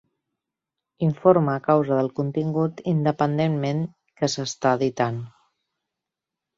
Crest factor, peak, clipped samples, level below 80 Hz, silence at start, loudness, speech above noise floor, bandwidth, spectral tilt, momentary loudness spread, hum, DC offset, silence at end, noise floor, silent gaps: 20 dB; -4 dBFS; under 0.1%; -64 dBFS; 1 s; -23 LUFS; 65 dB; 7.8 kHz; -6.5 dB/octave; 8 LU; none; under 0.1%; 1.3 s; -86 dBFS; none